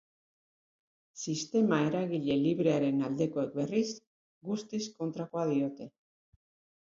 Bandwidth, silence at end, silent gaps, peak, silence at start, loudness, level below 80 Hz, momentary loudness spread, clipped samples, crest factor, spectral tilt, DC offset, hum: 7.6 kHz; 0.95 s; 4.07-4.41 s; -14 dBFS; 1.15 s; -32 LUFS; -74 dBFS; 11 LU; under 0.1%; 18 dB; -6 dB/octave; under 0.1%; none